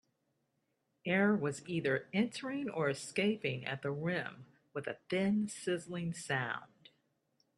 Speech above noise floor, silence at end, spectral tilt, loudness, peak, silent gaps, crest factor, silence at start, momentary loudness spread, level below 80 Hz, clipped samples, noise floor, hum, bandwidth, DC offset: 46 dB; 0.95 s; -5.5 dB/octave; -36 LUFS; -18 dBFS; none; 18 dB; 1.05 s; 11 LU; -76 dBFS; under 0.1%; -81 dBFS; none; 12 kHz; under 0.1%